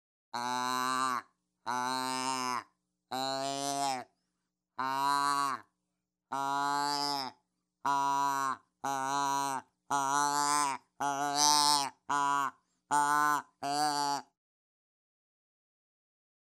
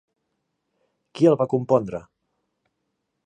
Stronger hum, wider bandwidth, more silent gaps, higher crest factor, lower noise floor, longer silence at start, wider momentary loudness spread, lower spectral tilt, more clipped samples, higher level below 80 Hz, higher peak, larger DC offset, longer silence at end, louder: neither; first, 16 kHz vs 9.6 kHz; neither; about the same, 24 dB vs 20 dB; first, -86 dBFS vs -77 dBFS; second, 0.35 s vs 1.15 s; second, 11 LU vs 15 LU; second, -1.5 dB/octave vs -8.5 dB/octave; neither; second, -90 dBFS vs -62 dBFS; second, -10 dBFS vs -4 dBFS; neither; first, 2.2 s vs 1.25 s; second, -32 LUFS vs -21 LUFS